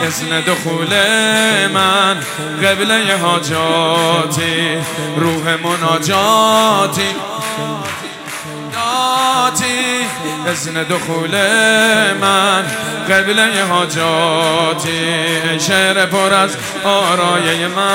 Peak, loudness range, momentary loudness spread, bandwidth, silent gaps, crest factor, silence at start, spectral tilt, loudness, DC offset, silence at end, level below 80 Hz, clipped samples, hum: 0 dBFS; 4 LU; 9 LU; 19.5 kHz; none; 14 dB; 0 s; -3 dB/octave; -13 LUFS; under 0.1%; 0 s; -58 dBFS; under 0.1%; none